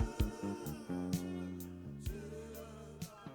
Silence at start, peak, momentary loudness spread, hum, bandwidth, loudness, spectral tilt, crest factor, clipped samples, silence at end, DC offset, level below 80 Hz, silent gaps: 0 s; -20 dBFS; 10 LU; none; over 20 kHz; -43 LUFS; -6.5 dB/octave; 22 dB; under 0.1%; 0 s; under 0.1%; -48 dBFS; none